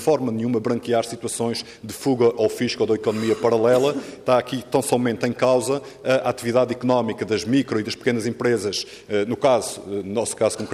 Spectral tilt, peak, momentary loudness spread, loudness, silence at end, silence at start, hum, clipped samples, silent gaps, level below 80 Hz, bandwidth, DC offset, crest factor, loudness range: -5 dB/octave; -6 dBFS; 7 LU; -22 LUFS; 0 s; 0 s; none; under 0.1%; none; -62 dBFS; 15.5 kHz; under 0.1%; 16 dB; 2 LU